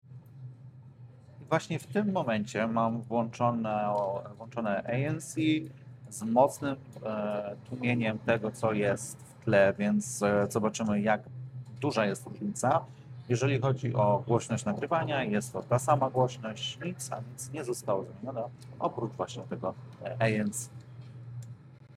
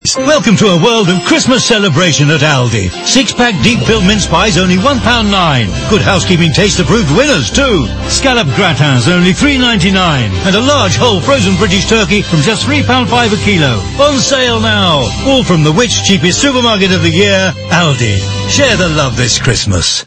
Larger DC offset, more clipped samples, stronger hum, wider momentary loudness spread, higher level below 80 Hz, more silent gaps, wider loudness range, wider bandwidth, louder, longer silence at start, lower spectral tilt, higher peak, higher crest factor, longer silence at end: neither; second, under 0.1% vs 0.6%; neither; first, 17 LU vs 3 LU; second, -70 dBFS vs -26 dBFS; neither; first, 6 LU vs 1 LU; first, 15 kHz vs 11 kHz; second, -31 LUFS vs -9 LUFS; about the same, 0.1 s vs 0.05 s; first, -6 dB/octave vs -4 dB/octave; second, -10 dBFS vs 0 dBFS; first, 20 dB vs 8 dB; about the same, 0 s vs 0 s